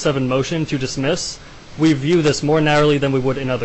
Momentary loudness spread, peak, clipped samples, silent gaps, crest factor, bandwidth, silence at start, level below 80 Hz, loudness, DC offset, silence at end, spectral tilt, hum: 8 LU; -6 dBFS; under 0.1%; none; 12 dB; 8.4 kHz; 0 s; -42 dBFS; -18 LUFS; under 0.1%; 0 s; -5.5 dB/octave; none